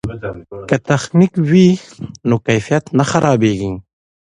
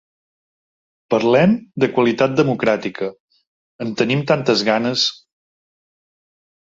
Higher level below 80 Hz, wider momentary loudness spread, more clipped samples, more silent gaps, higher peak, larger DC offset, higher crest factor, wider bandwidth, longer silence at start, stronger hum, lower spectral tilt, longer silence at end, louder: first, -44 dBFS vs -58 dBFS; first, 16 LU vs 11 LU; neither; second, none vs 3.20-3.28 s, 3.47-3.79 s; about the same, 0 dBFS vs -2 dBFS; neither; about the same, 14 dB vs 18 dB; first, 10.5 kHz vs 7.8 kHz; second, 0.05 s vs 1.1 s; neither; about the same, -6.5 dB/octave vs -5.5 dB/octave; second, 0.4 s vs 1.5 s; first, -15 LUFS vs -18 LUFS